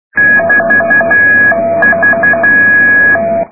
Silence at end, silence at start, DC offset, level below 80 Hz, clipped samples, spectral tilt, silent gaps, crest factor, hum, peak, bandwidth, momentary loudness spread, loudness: 0.05 s; 0.15 s; 1%; -44 dBFS; under 0.1%; -11 dB/octave; none; 8 dB; none; 0 dBFS; 2.6 kHz; 4 LU; -6 LUFS